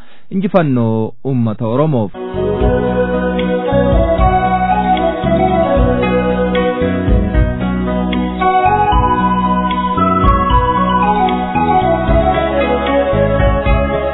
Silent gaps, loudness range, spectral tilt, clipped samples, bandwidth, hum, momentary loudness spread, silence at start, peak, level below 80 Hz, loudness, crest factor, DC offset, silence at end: none; 2 LU; -11 dB/octave; under 0.1%; 4.1 kHz; none; 5 LU; 0 s; 0 dBFS; -22 dBFS; -14 LUFS; 12 dB; under 0.1%; 0 s